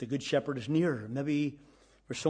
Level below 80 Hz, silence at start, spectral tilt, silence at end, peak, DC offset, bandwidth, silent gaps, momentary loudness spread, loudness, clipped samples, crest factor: -68 dBFS; 0 s; -6 dB/octave; 0 s; -14 dBFS; under 0.1%; 10 kHz; none; 6 LU; -32 LUFS; under 0.1%; 18 dB